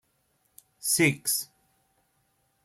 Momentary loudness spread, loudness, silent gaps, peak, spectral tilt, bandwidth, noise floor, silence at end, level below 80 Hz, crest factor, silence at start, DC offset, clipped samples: 12 LU; -25 LUFS; none; -10 dBFS; -3 dB/octave; 16.5 kHz; -72 dBFS; 1.2 s; -70 dBFS; 22 dB; 0.85 s; under 0.1%; under 0.1%